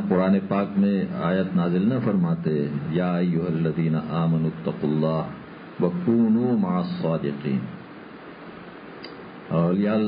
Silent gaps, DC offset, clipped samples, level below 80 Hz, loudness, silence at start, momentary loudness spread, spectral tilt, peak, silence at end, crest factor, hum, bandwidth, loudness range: none; under 0.1%; under 0.1%; -56 dBFS; -24 LUFS; 0 s; 19 LU; -12.5 dB/octave; -8 dBFS; 0 s; 16 dB; none; 5.2 kHz; 4 LU